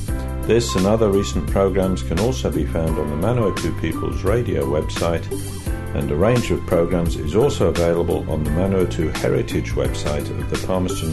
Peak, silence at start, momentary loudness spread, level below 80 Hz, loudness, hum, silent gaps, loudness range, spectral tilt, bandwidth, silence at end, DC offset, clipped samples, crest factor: -4 dBFS; 0 s; 7 LU; -30 dBFS; -20 LUFS; none; none; 2 LU; -6 dB/octave; 12.5 kHz; 0 s; under 0.1%; under 0.1%; 14 dB